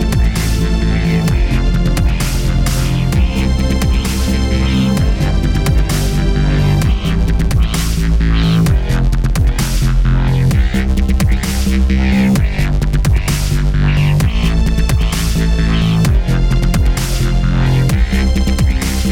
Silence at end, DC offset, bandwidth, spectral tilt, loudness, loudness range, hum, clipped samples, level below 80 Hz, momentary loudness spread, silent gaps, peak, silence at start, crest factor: 0 s; under 0.1%; 16.5 kHz; -6 dB/octave; -14 LUFS; 1 LU; none; under 0.1%; -14 dBFS; 3 LU; none; -4 dBFS; 0 s; 8 dB